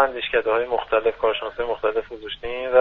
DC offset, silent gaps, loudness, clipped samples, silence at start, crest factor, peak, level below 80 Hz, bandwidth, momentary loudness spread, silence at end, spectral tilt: under 0.1%; none; -23 LUFS; under 0.1%; 0 s; 20 dB; -2 dBFS; -48 dBFS; 4.7 kHz; 9 LU; 0 s; -6 dB/octave